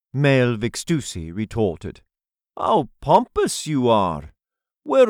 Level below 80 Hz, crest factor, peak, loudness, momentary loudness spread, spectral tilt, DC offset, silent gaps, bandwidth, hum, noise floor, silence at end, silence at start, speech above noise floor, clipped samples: -46 dBFS; 18 dB; -4 dBFS; -21 LUFS; 13 LU; -5.5 dB/octave; under 0.1%; none; 16 kHz; none; -87 dBFS; 0 s; 0.15 s; 67 dB; under 0.1%